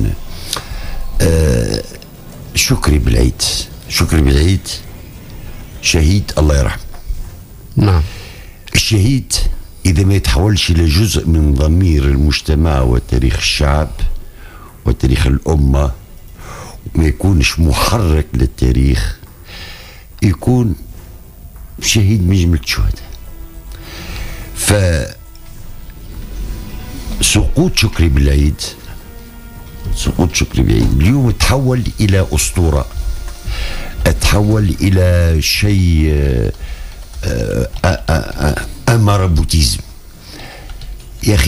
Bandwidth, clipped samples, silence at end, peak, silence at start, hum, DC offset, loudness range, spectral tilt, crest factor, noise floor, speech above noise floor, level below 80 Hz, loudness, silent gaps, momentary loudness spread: 15.5 kHz; under 0.1%; 0 s; 0 dBFS; 0 s; none; under 0.1%; 4 LU; -5 dB/octave; 14 dB; -34 dBFS; 22 dB; -20 dBFS; -14 LUFS; none; 20 LU